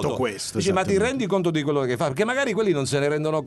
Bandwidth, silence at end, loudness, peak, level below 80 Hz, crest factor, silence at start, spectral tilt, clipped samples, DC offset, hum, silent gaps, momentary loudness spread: 12 kHz; 0 s; -23 LUFS; -8 dBFS; -54 dBFS; 14 dB; 0 s; -5 dB/octave; under 0.1%; under 0.1%; none; none; 4 LU